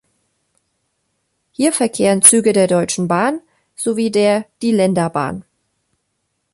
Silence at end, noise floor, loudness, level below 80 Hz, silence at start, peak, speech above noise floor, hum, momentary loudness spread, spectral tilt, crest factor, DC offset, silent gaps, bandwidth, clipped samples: 1.15 s; -71 dBFS; -15 LUFS; -58 dBFS; 1.6 s; 0 dBFS; 56 dB; none; 15 LU; -4 dB/octave; 18 dB; under 0.1%; none; 16 kHz; 0.1%